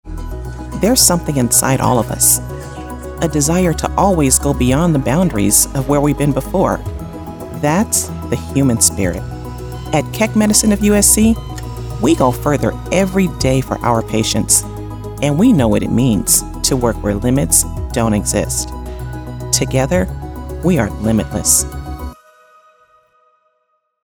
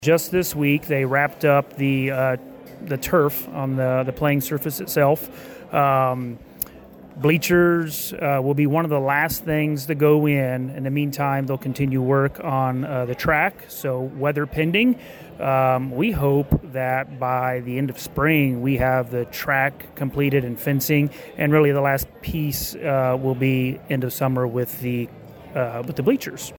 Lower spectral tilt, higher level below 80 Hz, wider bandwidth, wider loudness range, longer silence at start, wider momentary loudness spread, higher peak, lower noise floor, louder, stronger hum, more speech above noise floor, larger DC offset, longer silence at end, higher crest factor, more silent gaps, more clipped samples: second, -4.5 dB/octave vs -6 dB/octave; first, -28 dBFS vs -44 dBFS; about the same, over 20 kHz vs over 20 kHz; about the same, 4 LU vs 2 LU; about the same, 0.05 s vs 0 s; first, 16 LU vs 9 LU; first, 0 dBFS vs -6 dBFS; first, -66 dBFS vs -43 dBFS; first, -14 LUFS vs -21 LUFS; neither; first, 52 dB vs 22 dB; neither; first, 1.9 s vs 0 s; about the same, 16 dB vs 16 dB; neither; neither